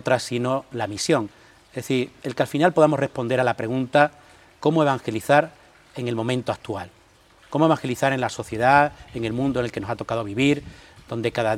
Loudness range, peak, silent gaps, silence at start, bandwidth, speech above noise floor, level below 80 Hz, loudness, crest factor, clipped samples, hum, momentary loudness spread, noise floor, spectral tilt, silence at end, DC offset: 3 LU; -2 dBFS; none; 0.05 s; 16 kHz; 32 dB; -54 dBFS; -23 LUFS; 22 dB; under 0.1%; none; 12 LU; -54 dBFS; -5.5 dB/octave; 0 s; under 0.1%